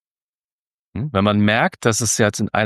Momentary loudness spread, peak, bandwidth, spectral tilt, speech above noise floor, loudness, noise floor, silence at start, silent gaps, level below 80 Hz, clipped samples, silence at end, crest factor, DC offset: 10 LU; -2 dBFS; 12.5 kHz; -4 dB/octave; over 72 dB; -18 LUFS; under -90 dBFS; 0.95 s; none; -54 dBFS; under 0.1%; 0 s; 18 dB; under 0.1%